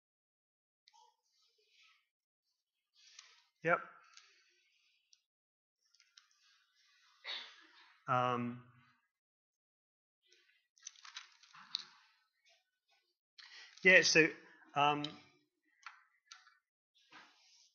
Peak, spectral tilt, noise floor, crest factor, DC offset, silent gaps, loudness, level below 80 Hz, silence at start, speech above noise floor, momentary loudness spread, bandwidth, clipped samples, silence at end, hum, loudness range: -12 dBFS; -1.5 dB/octave; -89 dBFS; 30 dB; under 0.1%; 5.26-5.76 s, 9.11-10.22 s, 10.69-10.75 s, 13.19-13.37 s, 16.69-16.94 s; -33 LUFS; under -90 dBFS; 3.65 s; 57 dB; 29 LU; 7 kHz; under 0.1%; 0.55 s; none; 19 LU